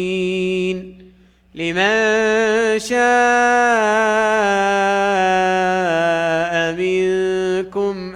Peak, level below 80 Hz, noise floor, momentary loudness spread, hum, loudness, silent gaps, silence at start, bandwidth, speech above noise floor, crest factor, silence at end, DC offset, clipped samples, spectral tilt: -4 dBFS; -52 dBFS; -49 dBFS; 7 LU; none; -16 LUFS; none; 0 s; 12 kHz; 33 dB; 12 dB; 0 s; under 0.1%; under 0.1%; -4 dB/octave